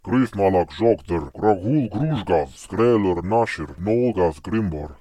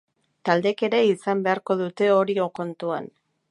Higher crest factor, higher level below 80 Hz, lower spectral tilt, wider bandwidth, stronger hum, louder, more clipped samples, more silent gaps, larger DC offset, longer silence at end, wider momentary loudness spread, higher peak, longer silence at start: about the same, 16 dB vs 20 dB; first, -46 dBFS vs -76 dBFS; first, -8 dB/octave vs -6.5 dB/octave; first, 12 kHz vs 10.5 kHz; neither; about the same, -21 LUFS vs -23 LUFS; neither; neither; neither; second, 0.05 s vs 0.45 s; second, 6 LU vs 10 LU; about the same, -4 dBFS vs -4 dBFS; second, 0.05 s vs 0.45 s